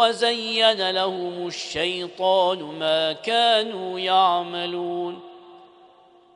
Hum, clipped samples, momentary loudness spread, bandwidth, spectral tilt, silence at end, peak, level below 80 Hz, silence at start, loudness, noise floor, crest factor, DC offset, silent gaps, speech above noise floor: none; under 0.1%; 10 LU; 10.5 kHz; -3 dB/octave; 0.7 s; -4 dBFS; -66 dBFS; 0 s; -22 LUFS; -53 dBFS; 18 dB; under 0.1%; none; 31 dB